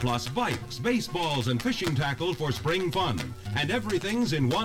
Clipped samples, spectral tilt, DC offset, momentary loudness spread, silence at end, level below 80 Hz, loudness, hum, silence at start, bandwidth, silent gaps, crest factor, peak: under 0.1%; -5 dB/octave; under 0.1%; 3 LU; 0 s; -50 dBFS; -28 LUFS; none; 0 s; 17 kHz; none; 16 dB; -12 dBFS